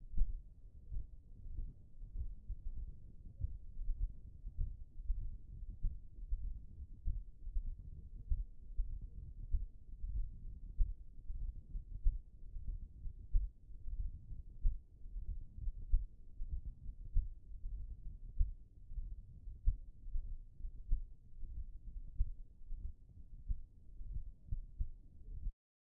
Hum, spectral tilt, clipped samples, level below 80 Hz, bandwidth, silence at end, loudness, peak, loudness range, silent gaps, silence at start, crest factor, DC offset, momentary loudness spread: none; -18 dB/octave; under 0.1%; -42 dBFS; 0.6 kHz; 0.5 s; -49 LUFS; -20 dBFS; 4 LU; none; 0 s; 22 dB; under 0.1%; 12 LU